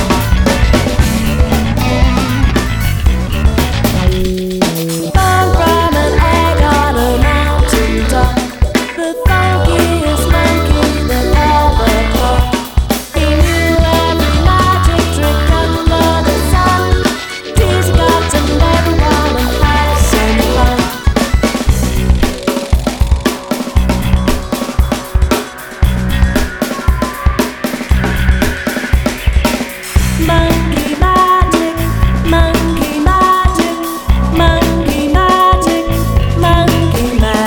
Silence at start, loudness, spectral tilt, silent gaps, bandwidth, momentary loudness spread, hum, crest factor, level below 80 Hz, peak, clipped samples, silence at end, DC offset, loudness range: 0 s; -12 LUFS; -5.5 dB/octave; none; 19.5 kHz; 5 LU; none; 10 dB; -14 dBFS; 0 dBFS; under 0.1%; 0 s; 0.3%; 3 LU